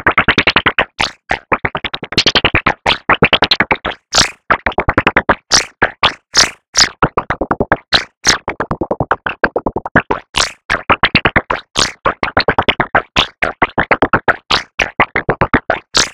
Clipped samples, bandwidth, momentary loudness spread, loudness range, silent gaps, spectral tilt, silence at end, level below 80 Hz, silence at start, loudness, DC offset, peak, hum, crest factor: under 0.1%; 17.5 kHz; 7 LU; 2 LU; 6.68-6.73 s, 8.17-8.21 s, 9.91-9.95 s, 10.65-10.69 s, 14.74-14.78 s; -2.5 dB/octave; 0 s; -32 dBFS; 0.05 s; -13 LUFS; under 0.1%; 0 dBFS; none; 14 dB